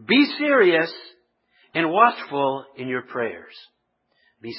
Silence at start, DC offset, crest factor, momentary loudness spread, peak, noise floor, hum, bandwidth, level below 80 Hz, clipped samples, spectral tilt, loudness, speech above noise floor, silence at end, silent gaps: 0.1 s; under 0.1%; 20 dB; 14 LU; -2 dBFS; -70 dBFS; none; 5.8 kHz; -74 dBFS; under 0.1%; -9.5 dB/octave; -21 LUFS; 49 dB; 0 s; none